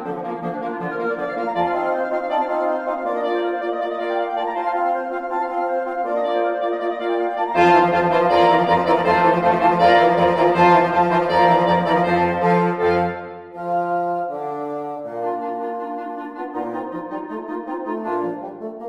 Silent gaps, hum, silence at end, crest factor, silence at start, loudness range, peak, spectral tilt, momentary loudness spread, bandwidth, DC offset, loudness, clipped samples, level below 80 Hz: none; none; 0 s; 18 dB; 0 s; 12 LU; -2 dBFS; -7 dB/octave; 14 LU; 10 kHz; under 0.1%; -20 LUFS; under 0.1%; -54 dBFS